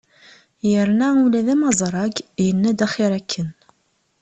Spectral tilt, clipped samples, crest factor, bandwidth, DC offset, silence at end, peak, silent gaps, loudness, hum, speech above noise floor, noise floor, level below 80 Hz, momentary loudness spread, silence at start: -5 dB/octave; under 0.1%; 18 dB; 8.6 kHz; under 0.1%; 0.7 s; -2 dBFS; none; -19 LUFS; none; 48 dB; -66 dBFS; -58 dBFS; 9 LU; 0.65 s